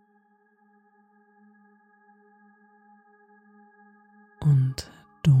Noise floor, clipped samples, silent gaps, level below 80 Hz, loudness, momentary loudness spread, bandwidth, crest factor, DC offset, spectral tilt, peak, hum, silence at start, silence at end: -64 dBFS; under 0.1%; none; -56 dBFS; -24 LUFS; 17 LU; 9.6 kHz; 20 dB; under 0.1%; -7.5 dB/octave; -10 dBFS; none; 4.4 s; 0 s